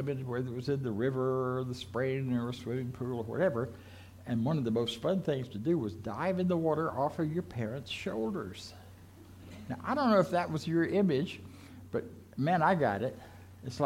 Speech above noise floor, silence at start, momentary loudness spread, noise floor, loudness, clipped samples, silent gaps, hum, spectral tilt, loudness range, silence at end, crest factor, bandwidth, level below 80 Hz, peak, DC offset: 21 dB; 0 s; 18 LU; -53 dBFS; -33 LUFS; under 0.1%; none; none; -7 dB/octave; 3 LU; 0 s; 18 dB; 16.5 kHz; -64 dBFS; -14 dBFS; under 0.1%